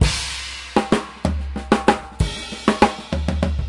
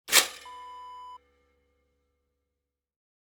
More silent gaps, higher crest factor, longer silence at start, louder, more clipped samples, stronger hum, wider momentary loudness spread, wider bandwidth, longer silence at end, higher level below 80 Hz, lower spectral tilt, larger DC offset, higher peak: neither; second, 20 dB vs 32 dB; about the same, 0 s vs 0.05 s; about the same, -21 LUFS vs -23 LUFS; neither; neither; second, 8 LU vs 24 LU; second, 11.5 kHz vs over 20 kHz; second, 0 s vs 2.1 s; first, -28 dBFS vs -74 dBFS; first, -5 dB/octave vs 2 dB/octave; neither; about the same, -2 dBFS vs -2 dBFS